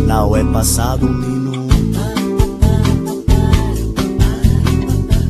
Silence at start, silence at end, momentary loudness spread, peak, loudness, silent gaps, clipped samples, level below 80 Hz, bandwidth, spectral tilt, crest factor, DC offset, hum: 0 s; 0 s; 5 LU; 0 dBFS; -15 LUFS; none; under 0.1%; -18 dBFS; 14 kHz; -6 dB/octave; 14 dB; under 0.1%; none